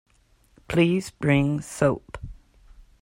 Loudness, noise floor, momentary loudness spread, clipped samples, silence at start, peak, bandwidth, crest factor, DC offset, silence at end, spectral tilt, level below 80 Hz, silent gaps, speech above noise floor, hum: -24 LUFS; -61 dBFS; 19 LU; under 0.1%; 0.7 s; -6 dBFS; 16 kHz; 20 dB; under 0.1%; 0.7 s; -6.5 dB/octave; -48 dBFS; none; 38 dB; none